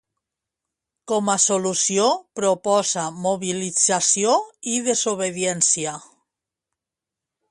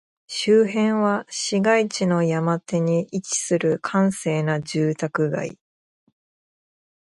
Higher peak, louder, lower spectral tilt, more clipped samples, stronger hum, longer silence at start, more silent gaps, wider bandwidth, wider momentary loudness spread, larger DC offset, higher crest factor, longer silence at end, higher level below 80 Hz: about the same, -4 dBFS vs -4 dBFS; about the same, -20 LUFS vs -22 LUFS; second, -2.5 dB/octave vs -5 dB/octave; neither; neither; first, 1.05 s vs 0.3 s; neither; about the same, 11.5 kHz vs 11.5 kHz; about the same, 7 LU vs 6 LU; neither; about the same, 18 dB vs 18 dB; about the same, 1.5 s vs 1.5 s; about the same, -70 dBFS vs -66 dBFS